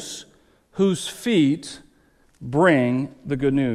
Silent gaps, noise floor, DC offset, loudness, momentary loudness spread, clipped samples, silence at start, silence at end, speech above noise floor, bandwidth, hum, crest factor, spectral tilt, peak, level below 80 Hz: none; -59 dBFS; under 0.1%; -21 LUFS; 20 LU; under 0.1%; 0 s; 0 s; 38 dB; 14 kHz; none; 18 dB; -6 dB/octave; -4 dBFS; -52 dBFS